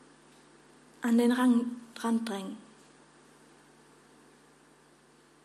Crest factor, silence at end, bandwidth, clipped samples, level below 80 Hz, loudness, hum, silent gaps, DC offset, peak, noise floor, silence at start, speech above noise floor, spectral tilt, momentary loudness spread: 18 dB; 2.85 s; 13 kHz; under 0.1%; -80 dBFS; -29 LUFS; none; none; under 0.1%; -14 dBFS; -61 dBFS; 1 s; 33 dB; -5 dB/octave; 15 LU